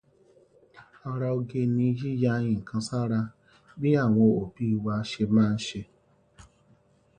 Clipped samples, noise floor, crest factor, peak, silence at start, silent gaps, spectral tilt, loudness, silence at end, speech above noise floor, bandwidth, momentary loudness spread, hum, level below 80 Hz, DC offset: under 0.1%; -62 dBFS; 18 dB; -10 dBFS; 0.75 s; none; -7.5 dB/octave; -27 LUFS; 0.75 s; 37 dB; 9.6 kHz; 10 LU; none; -58 dBFS; under 0.1%